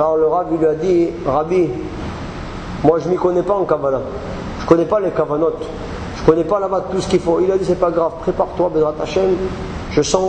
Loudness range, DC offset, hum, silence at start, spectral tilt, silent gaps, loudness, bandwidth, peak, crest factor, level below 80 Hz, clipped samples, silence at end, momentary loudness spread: 1 LU; under 0.1%; none; 0 s; -6.5 dB/octave; none; -17 LUFS; 9.4 kHz; 0 dBFS; 16 dB; -36 dBFS; under 0.1%; 0 s; 11 LU